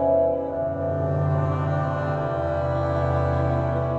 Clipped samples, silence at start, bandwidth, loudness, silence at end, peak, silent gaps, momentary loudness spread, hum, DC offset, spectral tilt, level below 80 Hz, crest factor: under 0.1%; 0 s; 7.2 kHz; -24 LUFS; 0 s; -10 dBFS; none; 3 LU; none; under 0.1%; -9.5 dB/octave; -38 dBFS; 14 dB